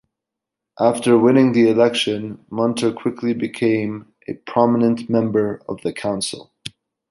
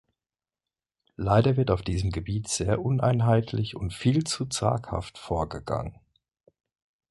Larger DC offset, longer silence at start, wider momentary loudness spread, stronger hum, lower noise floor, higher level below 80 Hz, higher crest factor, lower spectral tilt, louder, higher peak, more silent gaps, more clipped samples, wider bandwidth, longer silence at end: neither; second, 0.8 s vs 1.2 s; first, 18 LU vs 10 LU; neither; second, -84 dBFS vs under -90 dBFS; second, -60 dBFS vs -44 dBFS; about the same, 16 dB vs 20 dB; about the same, -5.5 dB/octave vs -6 dB/octave; first, -18 LUFS vs -27 LUFS; first, -2 dBFS vs -6 dBFS; neither; neither; about the same, 11.5 kHz vs 11.5 kHz; second, 0.45 s vs 1.2 s